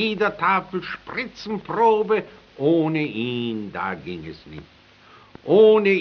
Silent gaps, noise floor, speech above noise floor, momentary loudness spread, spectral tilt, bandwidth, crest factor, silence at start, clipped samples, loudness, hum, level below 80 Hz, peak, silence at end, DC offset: none; -50 dBFS; 29 dB; 22 LU; -4 dB/octave; 6.2 kHz; 18 dB; 0 s; under 0.1%; -21 LUFS; none; -58 dBFS; -4 dBFS; 0 s; under 0.1%